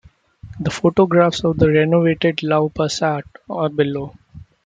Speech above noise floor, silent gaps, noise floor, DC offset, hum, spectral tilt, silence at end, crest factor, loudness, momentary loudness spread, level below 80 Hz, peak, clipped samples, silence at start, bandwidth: 24 dB; none; -40 dBFS; under 0.1%; none; -6.5 dB/octave; 0.2 s; 16 dB; -18 LUFS; 12 LU; -46 dBFS; -2 dBFS; under 0.1%; 0.45 s; 9.2 kHz